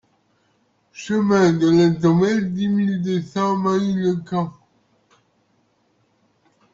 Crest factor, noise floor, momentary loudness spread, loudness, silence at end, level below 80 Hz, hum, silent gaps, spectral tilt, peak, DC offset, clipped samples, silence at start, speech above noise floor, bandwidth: 16 dB; -64 dBFS; 9 LU; -19 LUFS; 2.2 s; -58 dBFS; none; none; -7 dB/octave; -6 dBFS; under 0.1%; under 0.1%; 0.95 s; 46 dB; 7.6 kHz